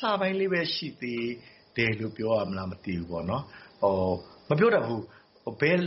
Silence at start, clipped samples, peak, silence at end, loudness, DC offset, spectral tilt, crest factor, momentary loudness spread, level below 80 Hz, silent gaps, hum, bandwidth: 0 s; under 0.1%; -10 dBFS; 0 s; -29 LUFS; under 0.1%; -4.5 dB/octave; 18 dB; 12 LU; -60 dBFS; none; none; 6 kHz